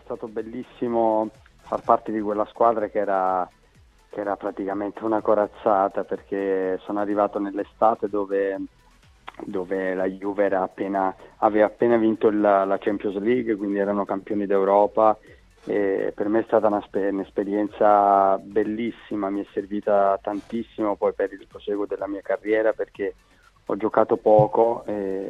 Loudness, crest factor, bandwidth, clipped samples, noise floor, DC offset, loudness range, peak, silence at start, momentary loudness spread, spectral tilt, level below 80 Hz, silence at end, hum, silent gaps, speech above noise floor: -23 LUFS; 20 dB; 7.6 kHz; under 0.1%; -55 dBFS; under 0.1%; 4 LU; -2 dBFS; 0.1 s; 12 LU; -8.5 dB/octave; -58 dBFS; 0 s; none; none; 33 dB